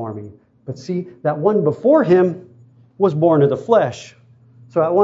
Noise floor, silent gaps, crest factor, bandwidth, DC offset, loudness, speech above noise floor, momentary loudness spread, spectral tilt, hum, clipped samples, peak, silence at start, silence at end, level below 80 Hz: -48 dBFS; none; 16 dB; 7.8 kHz; under 0.1%; -17 LUFS; 32 dB; 19 LU; -8.5 dB/octave; none; under 0.1%; -2 dBFS; 0 s; 0 s; -64 dBFS